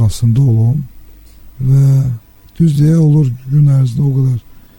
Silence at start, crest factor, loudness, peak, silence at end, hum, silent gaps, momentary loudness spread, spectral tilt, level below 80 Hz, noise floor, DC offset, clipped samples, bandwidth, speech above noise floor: 0 s; 10 dB; -12 LUFS; -2 dBFS; 0.2 s; none; none; 10 LU; -9 dB/octave; -36 dBFS; -36 dBFS; under 0.1%; under 0.1%; 17 kHz; 26 dB